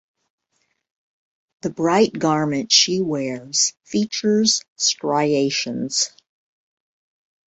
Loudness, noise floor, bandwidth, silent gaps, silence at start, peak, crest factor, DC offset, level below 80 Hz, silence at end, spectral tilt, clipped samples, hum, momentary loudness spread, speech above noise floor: -19 LUFS; -71 dBFS; 8.2 kHz; 4.68-4.76 s; 1.65 s; -2 dBFS; 20 dB; under 0.1%; -64 dBFS; 1.4 s; -3 dB/octave; under 0.1%; none; 9 LU; 51 dB